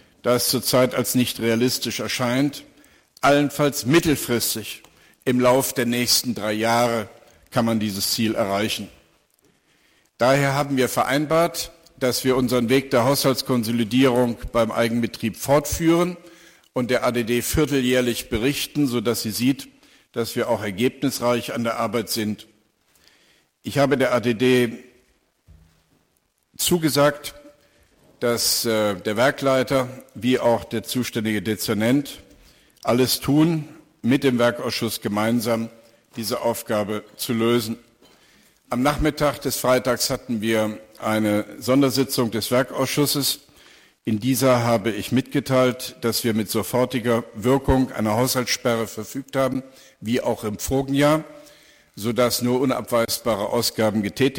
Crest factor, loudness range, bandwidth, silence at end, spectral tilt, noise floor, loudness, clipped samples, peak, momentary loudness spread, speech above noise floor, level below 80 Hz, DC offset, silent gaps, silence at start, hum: 16 dB; 4 LU; 17 kHz; 0 s; -4.5 dB/octave; -68 dBFS; -21 LUFS; under 0.1%; -6 dBFS; 9 LU; 47 dB; -46 dBFS; under 0.1%; none; 0.25 s; none